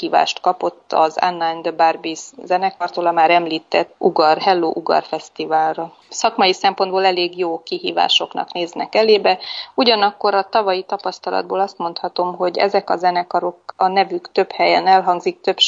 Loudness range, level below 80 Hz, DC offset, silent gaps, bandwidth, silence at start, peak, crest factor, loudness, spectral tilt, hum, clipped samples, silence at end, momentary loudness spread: 2 LU; -70 dBFS; under 0.1%; none; 7.8 kHz; 0 s; -2 dBFS; 16 dB; -18 LUFS; -3.5 dB/octave; none; under 0.1%; 0 s; 9 LU